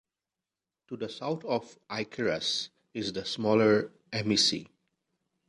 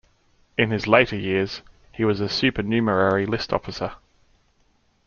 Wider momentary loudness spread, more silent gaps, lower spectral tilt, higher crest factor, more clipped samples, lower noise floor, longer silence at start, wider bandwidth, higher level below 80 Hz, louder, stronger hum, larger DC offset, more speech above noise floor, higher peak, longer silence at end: about the same, 14 LU vs 13 LU; neither; second, -4 dB/octave vs -6 dB/octave; about the same, 20 dB vs 22 dB; neither; first, under -90 dBFS vs -63 dBFS; first, 0.9 s vs 0.6 s; first, 11 kHz vs 7.2 kHz; second, -68 dBFS vs -50 dBFS; second, -29 LUFS vs -22 LUFS; neither; neither; first, over 61 dB vs 42 dB; second, -12 dBFS vs -2 dBFS; second, 0.85 s vs 1.1 s